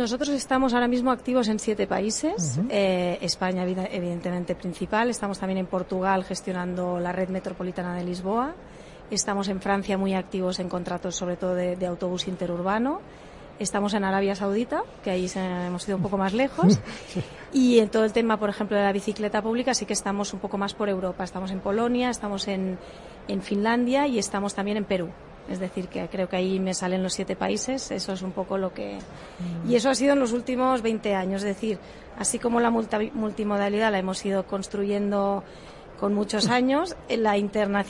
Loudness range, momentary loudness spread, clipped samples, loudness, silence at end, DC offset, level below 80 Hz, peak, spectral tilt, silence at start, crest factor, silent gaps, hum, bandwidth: 4 LU; 10 LU; under 0.1%; -26 LUFS; 0 s; under 0.1%; -52 dBFS; -6 dBFS; -5 dB/octave; 0 s; 20 dB; none; none; 11.5 kHz